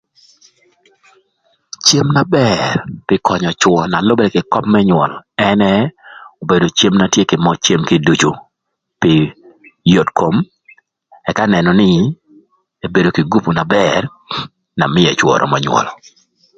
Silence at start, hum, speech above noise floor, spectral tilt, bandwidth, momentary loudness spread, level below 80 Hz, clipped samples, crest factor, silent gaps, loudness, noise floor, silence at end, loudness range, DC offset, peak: 1.85 s; none; 62 dB; -5 dB/octave; 9.2 kHz; 11 LU; -46 dBFS; under 0.1%; 14 dB; none; -13 LUFS; -74 dBFS; 0.65 s; 2 LU; under 0.1%; 0 dBFS